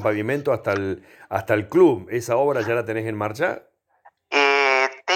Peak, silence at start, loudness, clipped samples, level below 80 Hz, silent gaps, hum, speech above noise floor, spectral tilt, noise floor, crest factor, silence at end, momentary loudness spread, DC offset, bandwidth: -4 dBFS; 0 s; -21 LUFS; under 0.1%; -64 dBFS; none; none; 35 dB; -5 dB/octave; -57 dBFS; 18 dB; 0 s; 11 LU; under 0.1%; 16.5 kHz